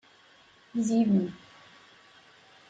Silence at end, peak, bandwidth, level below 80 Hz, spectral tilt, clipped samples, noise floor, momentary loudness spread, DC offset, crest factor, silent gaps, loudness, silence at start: 1.35 s; -14 dBFS; 9 kHz; -72 dBFS; -7 dB/octave; under 0.1%; -59 dBFS; 14 LU; under 0.1%; 16 dB; none; -28 LUFS; 0.75 s